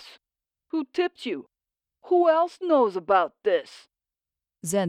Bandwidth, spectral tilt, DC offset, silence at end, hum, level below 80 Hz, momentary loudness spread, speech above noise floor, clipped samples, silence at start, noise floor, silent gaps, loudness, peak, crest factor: 14 kHz; -5 dB/octave; under 0.1%; 0 s; none; -74 dBFS; 13 LU; 66 dB; under 0.1%; 0.75 s; -90 dBFS; none; -24 LUFS; -10 dBFS; 16 dB